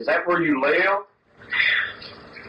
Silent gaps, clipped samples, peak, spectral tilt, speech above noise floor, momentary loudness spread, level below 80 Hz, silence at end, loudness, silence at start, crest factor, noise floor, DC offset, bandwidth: none; under 0.1%; -6 dBFS; -6 dB/octave; 20 dB; 13 LU; -62 dBFS; 0 s; -21 LUFS; 0 s; 16 dB; -41 dBFS; under 0.1%; 8.8 kHz